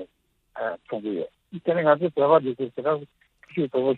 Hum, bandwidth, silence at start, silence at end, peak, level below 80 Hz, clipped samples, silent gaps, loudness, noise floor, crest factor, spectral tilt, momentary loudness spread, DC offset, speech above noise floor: none; 4.3 kHz; 0 s; 0 s; -4 dBFS; -70 dBFS; under 0.1%; none; -25 LUFS; -66 dBFS; 20 dB; -9.5 dB/octave; 14 LU; under 0.1%; 43 dB